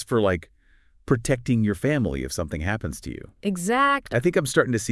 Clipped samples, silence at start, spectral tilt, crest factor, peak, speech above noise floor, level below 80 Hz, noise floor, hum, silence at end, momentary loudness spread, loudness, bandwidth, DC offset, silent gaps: under 0.1%; 0 s; -5.5 dB/octave; 20 dB; -4 dBFS; 34 dB; -44 dBFS; -57 dBFS; none; 0 s; 9 LU; -24 LUFS; 12 kHz; under 0.1%; none